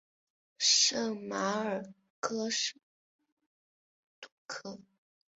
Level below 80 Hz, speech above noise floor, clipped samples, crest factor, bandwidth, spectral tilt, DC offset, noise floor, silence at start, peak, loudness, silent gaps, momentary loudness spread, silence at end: -82 dBFS; over 55 dB; under 0.1%; 22 dB; 8 kHz; -1 dB/octave; under 0.1%; under -90 dBFS; 0.6 s; -14 dBFS; -30 LUFS; 2.10-2.22 s, 2.83-3.19 s, 3.32-3.37 s, 3.46-4.22 s, 4.32-4.49 s; 19 LU; 0.6 s